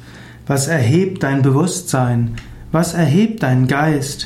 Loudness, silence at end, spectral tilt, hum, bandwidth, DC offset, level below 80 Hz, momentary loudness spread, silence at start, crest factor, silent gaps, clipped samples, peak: -16 LUFS; 0 s; -6 dB/octave; none; 15 kHz; under 0.1%; -42 dBFS; 7 LU; 0 s; 12 dB; none; under 0.1%; -4 dBFS